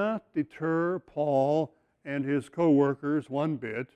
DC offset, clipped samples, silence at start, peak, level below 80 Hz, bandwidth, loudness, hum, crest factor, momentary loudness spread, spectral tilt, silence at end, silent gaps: under 0.1%; under 0.1%; 0 s; -12 dBFS; -72 dBFS; 9.8 kHz; -28 LUFS; none; 16 dB; 10 LU; -8.5 dB/octave; 0.1 s; none